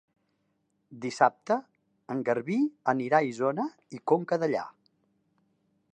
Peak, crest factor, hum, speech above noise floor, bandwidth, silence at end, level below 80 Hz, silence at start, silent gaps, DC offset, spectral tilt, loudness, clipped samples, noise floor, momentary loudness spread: -8 dBFS; 22 dB; none; 47 dB; 9.4 kHz; 1.25 s; -82 dBFS; 0.9 s; none; under 0.1%; -6.5 dB/octave; -29 LUFS; under 0.1%; -75 dBFS; 12 LU